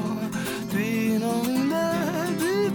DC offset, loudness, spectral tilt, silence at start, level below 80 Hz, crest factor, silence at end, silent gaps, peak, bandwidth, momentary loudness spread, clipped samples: under 0.1%; -25 LUFS; -5.5 dB/octave; 0 s; -58 dBFS; 12 dB; 0 s; none; -14 dBFS; 19 kHz; 4 LU; under 0.1%